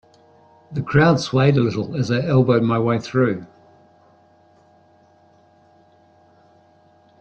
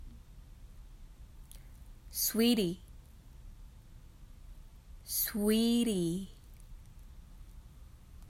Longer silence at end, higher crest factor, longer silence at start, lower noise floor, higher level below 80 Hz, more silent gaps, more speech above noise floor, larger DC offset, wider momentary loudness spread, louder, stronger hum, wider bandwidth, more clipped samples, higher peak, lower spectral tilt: first, 3.75 s vs 0 s; about the same, 18 dB vs 18 dB; first, 0.7 s vs 0 s; about the same, -54 dBFS vs -53 dBFS; about the same, -52 dBFS vs -52 dBFS; neither; first, 37 dB vs 23 dB; neither; second, 9 LU vs 28 LU; first, -19 LUFS vs -31 LUFS; neither; second, 8.4 kHz vs 16 kHz; neither; first, -4 dBFS vs -18 dBFS; first, -7.5 dB/octave vs -4 dB/octave